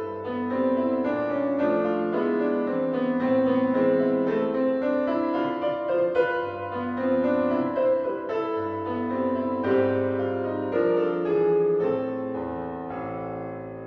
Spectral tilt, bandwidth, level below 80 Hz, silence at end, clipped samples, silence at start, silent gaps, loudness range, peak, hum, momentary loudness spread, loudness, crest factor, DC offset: -9 dB/octave; 5.2 kHz; -62 dBFS; 0 s; under 0.1%; 0 s; none; 2 LU; -10 dBFS; none; 8 LU; -25 LUFS; 16 dB; under 0.1%